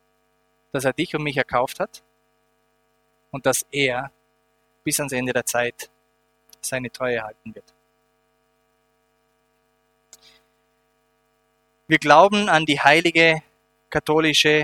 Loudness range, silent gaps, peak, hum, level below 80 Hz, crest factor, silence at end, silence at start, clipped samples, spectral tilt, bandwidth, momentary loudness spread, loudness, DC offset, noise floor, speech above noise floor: 14 LU; none; 0 dBFS; none; -58 dBFS; 24 dB; 0 s; 0.75 s; under 0.1%; -3.5 dB/octave; 18.5 kHz; 17 LU; -20 LUFS; under 0.1%; -66 dBFS; 46 dB